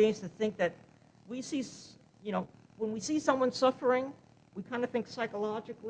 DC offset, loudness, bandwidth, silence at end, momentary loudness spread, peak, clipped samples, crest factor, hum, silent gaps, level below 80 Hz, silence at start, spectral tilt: under 0.1%; -33 LUFS; 9.6 kHz; 0 s; 17 LU; -12 dBFS; under 0.1%; 22 dB; none; none; -74 dBFS; 0 s; -4.5 dB/octave